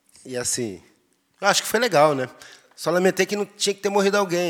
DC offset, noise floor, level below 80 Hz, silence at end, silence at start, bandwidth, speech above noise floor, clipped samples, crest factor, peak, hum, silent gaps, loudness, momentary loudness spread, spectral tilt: under 0.1%; -63 dBFS; -68 dBFS; 0 s; 0.25 s; 19.5 kHz; 42 dB; under 0.1%; 20 dB; -2 dBFS; none; none; -21 LUFS; 11 LU; -3 dB/octave